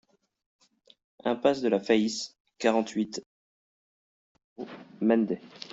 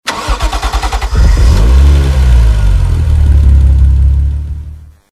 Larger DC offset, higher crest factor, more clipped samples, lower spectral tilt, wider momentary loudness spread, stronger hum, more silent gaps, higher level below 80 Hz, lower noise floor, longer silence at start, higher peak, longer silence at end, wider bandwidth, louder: neither; first, 20 dB vs 8 dB; second, under 0.1% vs 0.2%; about the same, -5 dB/octave vs -6 dB/octave; first, 17 LU vs 8 LU; neither; first, 2.40-2.45 s, 3.26-4.35 s, 4.44-4.56 s vs none; second, -74 dBFS vs -8 dBFS; first, under -90 dBFS vs -28 dBFS; first, 1.25 s vs 0.05 s; second, -10 dBFS vs 0 dBFS; second, 0 s vs 0.3 s; second, 8 kHz vs 11.5 kHz; second, -28 LUFS vs -10 LUFS